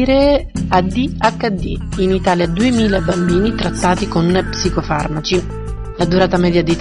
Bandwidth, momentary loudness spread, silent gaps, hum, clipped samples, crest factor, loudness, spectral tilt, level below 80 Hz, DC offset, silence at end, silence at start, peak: 11 kHz; 6 LU; none; none; under 0.1%; 14 dB; -16 LUFS; -6 dB/octave; -28 dBFS; under 0.1%; 0 s; 0 s; 0 dBFS